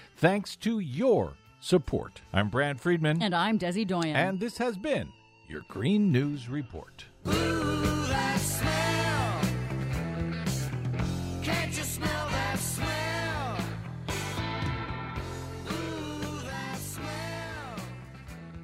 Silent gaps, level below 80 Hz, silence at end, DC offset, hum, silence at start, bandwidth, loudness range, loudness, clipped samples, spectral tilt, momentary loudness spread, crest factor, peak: none; -46 dBFS; 0 s; under 0.1%; none; 0 s; 16 kHz; 7 LU; -30 LUFS; under 0.1%; -5 dB/octave; 12 LU; 22 dB; -8 dBFS